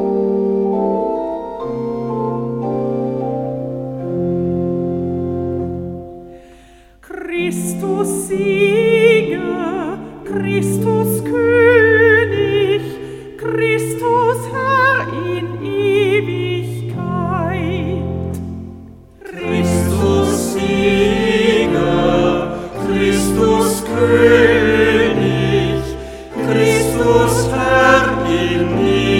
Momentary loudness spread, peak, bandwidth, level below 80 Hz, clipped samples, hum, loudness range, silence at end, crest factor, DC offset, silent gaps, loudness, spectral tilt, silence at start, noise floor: 13 LU; 0 dBFS; 17 kHz; -36 dBFS; under 0.1%; none; 8 LU; 0 s; 16 dB; under 0.1%; none; -16 LUFS; -5.5 dB/octave; 0 s; -44 dBFS